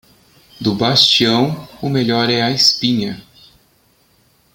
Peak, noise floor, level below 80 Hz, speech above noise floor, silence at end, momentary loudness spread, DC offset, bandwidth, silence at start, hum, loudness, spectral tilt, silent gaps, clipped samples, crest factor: 0 dBFS; -56 dBFS; -52 dBFS; 41 dB; 1.35 s; 13 LU; under 0.1%; 17 kHz; 0.6 s; none; -14 LUFS; -4 dB/octave; none; under 0.1%; 18 dB